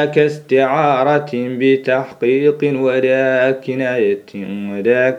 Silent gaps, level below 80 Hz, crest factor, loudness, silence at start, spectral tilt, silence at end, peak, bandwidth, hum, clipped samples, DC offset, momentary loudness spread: none; -70 dBFS; 16 dB; -16 LUFS; 0 s; -7 dB/octave; 0 s; 0 dBFS; 9.2 kHz; none; under 0.1%; under 0.1%; 7 LU